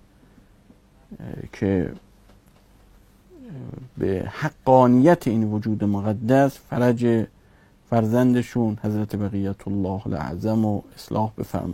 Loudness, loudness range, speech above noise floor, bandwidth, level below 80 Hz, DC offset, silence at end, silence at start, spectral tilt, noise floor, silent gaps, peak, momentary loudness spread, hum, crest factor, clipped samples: -22 LUFS; 12 LU; 33 dB; 16 kHz; -50 dBFS; under 0.1%; 0 s; 1.1 s; -8.5 dB/octave; -54 dBFS; none; -2 dBFS; 18 LU; none; 20 dB; under 0.1%